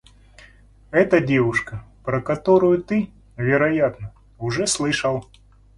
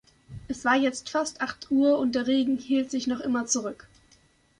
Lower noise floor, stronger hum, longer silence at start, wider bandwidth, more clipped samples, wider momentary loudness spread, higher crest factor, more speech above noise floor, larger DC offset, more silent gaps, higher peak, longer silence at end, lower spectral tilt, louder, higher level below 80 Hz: second, -49 dBFS vs -61 dBFS; neither; first, 0.9 s vs 0.3 s; about the same, 11.5 kHz vs 10.5 kHz; neither; about the same, 15 LU vs 14 LU; about the same, 18 dB vs 16 dB; second, 30 dB vs 36 dB; neither; neither; first, -4 dBFS vs -10 dBFS; second, 0.55 s vs 0.85 s; first, -5 dB/octave vs -3 dB/octave; first, -20 LUFS vs -26 LUFS; first, -48 dBFS vs -60 dBFS